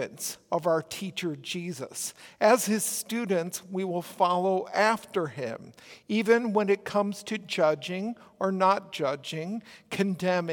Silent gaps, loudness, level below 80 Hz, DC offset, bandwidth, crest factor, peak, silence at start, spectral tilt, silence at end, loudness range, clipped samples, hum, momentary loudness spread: none; -28 LUFS; -76 dBFS; under 0.1%; 18 kHz; 20 dB; -10 dBFS; 0 s; -4 dB/octave; 0 s; 2 LU; under 0.1%; none; 12 LU